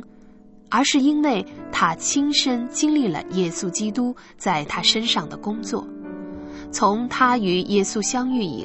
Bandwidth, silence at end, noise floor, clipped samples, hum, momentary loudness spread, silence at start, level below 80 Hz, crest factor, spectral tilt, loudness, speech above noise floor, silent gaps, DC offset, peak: 8.4 kHz; 0 s; -47 dBFS; under 0.1%; none; 11 LU; 0 s; -56 dBFS; 18 dB; -3 dB/octave; -21 LUFS; 26 dB; none; under 0.1%; -4 dBFS